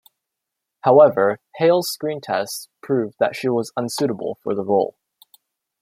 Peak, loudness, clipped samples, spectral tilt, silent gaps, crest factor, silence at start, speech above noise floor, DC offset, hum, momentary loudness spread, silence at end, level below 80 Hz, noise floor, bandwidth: -2 dBFS; -20 LUFS; under 0.1%; -5 dB/octave; none; 18 dB; 0.85 s; 63 dB; under 0.1%; none; 13 LU; 0.9 s; -70 dBFS; -82 dBFS; 16 kHz